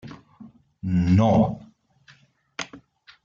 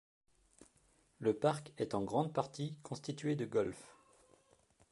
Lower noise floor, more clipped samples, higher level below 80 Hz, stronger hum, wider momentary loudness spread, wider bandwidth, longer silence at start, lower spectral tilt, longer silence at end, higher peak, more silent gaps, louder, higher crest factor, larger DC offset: second, -57 dBFS vs -72 dBFS; neither; first, -50 dBFS vs -72 dBFS; neither; first, 23 LU vs 10 LU; second, 7.4 kHz vs 11.5 kHz; second, 0.05 s vs 1.2 s; first, -8 dB/octave vs -6.5 dB/octave; second, 0.5 s vs 1 s; first, -8 dBFS vs -18 dBFS; neither; first, -22 LUFS vs -38 LUFS; about the same, 18 dB vs 22 dB; neither